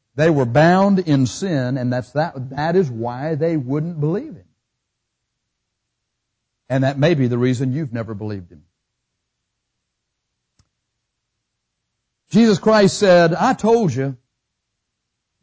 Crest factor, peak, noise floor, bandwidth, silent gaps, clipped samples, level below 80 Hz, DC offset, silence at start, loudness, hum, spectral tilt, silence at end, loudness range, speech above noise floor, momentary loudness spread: 16 dB; -4 dBFS; -77 dBFS; 8 kHz; none; under 0.1%; -54 dBFS; under 0.1%; 0.15 s; -18 LUFS; none; -6.5 dB/octave; 1.3 s; 11 LU; 60 dB; 13 LU